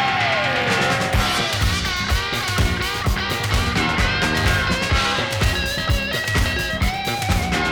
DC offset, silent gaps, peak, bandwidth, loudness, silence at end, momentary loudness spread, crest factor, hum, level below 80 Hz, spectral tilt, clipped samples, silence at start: under 0.1%; none; -6 dBFS; over 20 kHz; -20 LUFS; 0 s; 3 LU; 14 dB; none; -28 dBFS; -4 dB/octave; under 0.1%; 0 s